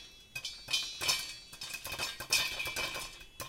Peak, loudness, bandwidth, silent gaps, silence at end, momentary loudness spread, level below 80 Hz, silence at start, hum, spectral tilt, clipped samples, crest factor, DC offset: -14 dBFS; -34 LUFS; 17 kHz; none; 0 s; 13 LU; -60 dBFS; 0 s; none; 0.5 dB/octave; under 0.1%; 24 dB; under 0.1%